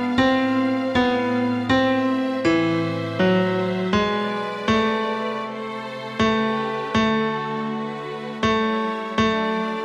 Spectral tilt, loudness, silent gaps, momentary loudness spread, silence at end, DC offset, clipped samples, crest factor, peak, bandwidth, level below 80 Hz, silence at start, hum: -6 dB/octave; -22 LUFS; none; 9 LU; 0 s; under 0.1%; under 0.1%; 16 dB; -6 dBFS; 9.8 kHz; -50 dBFS; 0 s; none